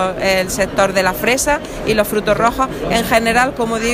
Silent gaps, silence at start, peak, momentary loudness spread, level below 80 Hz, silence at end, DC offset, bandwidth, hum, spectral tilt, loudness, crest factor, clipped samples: none; 0 s; 0 dBFS; 4 LU; -34 dBFS; 0 s; under 0.1%; 15.5 kHz; none; -3.5 dB/octave; -15 LUFS; 14 dB; under 0.1%